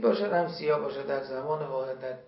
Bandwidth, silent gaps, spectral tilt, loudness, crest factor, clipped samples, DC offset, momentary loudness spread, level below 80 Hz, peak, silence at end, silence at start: 5.8 kHz; none; -10 dB/octave; -30 LUFS; 16 dB; under 0.1%; under 0.1%; 6 LU; -72 dBFS; -12 dBFS; 0 s; 0 s